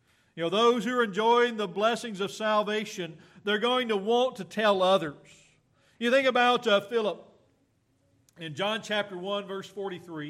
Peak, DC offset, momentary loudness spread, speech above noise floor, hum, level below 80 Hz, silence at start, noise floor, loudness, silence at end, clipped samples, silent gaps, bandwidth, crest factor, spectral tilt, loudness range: -12 dBFS; under 0.1%; 14 LU; 43 dB; none; -78 dBFS; 0.35 s; -70 dBFS; -27 LUFS; 0 s; under 0.1%; none; 14 kHz; 16 dB; -4 dB/octave; 4 LU